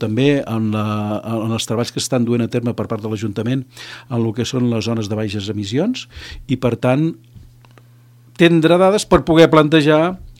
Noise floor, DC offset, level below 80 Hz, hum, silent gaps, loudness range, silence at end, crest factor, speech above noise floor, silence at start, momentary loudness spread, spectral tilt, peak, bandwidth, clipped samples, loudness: -46 dBFS; under 0.1%; -42 dBFS; none; none; 7 LU; 0.1 s; 16 dB; 30 dB; 0 s; 12 LU; -6 dB/octave; 0 dBFS; 15.5 kHz; under 0.1%; -17 LUFS